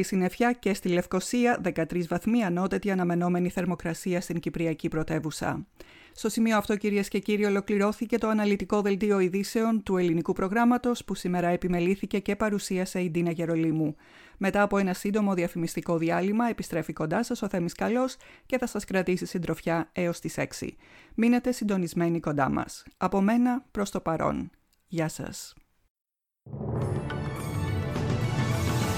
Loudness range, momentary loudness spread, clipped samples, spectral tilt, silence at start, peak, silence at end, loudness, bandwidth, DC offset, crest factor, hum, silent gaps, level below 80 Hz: 5 LU; 8 LU; under 0.1%; -6 dB/octave; 0 s; -12 dBFS; 0 s; -28 LUFS; 17 kHz; under 0.1%; 16 dB; none; 25.90-25.95 s; -52 dBFS